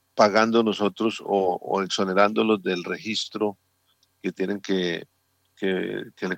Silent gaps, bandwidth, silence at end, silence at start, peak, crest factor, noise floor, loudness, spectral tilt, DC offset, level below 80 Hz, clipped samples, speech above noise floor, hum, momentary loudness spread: none; 15.5 kHz; 0 s; 0.15 s; -4 dBFS; 20 dB; -67 dBFS; -24 LUFS; -5 dB/octave; under 0.1%; -76 dBFS; under 0.1%; 43 dB; none; 10 LU